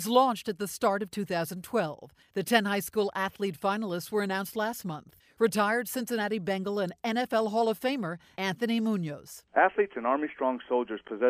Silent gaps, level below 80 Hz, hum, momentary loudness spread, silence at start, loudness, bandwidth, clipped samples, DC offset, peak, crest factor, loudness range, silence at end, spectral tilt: none; -72 dBFS; none; 9 LU; 0 s; -30 LUFS; 15.5 kHz; under 0.1%; under 0.1%; -8 dBFS; 20 dB; 1 LU; 0 s; -4.5 dB/octave